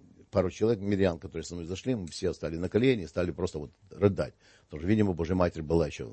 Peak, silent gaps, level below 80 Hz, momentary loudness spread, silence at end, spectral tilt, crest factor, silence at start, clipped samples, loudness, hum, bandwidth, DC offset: -10 dBFS; none; -50 dBFS; 11 LU; 0 s; -7 dB/octave; 20 dB; 0.2 s; under 0.1%; -30 LUFS; none; 8.8 kHz; under 0.1%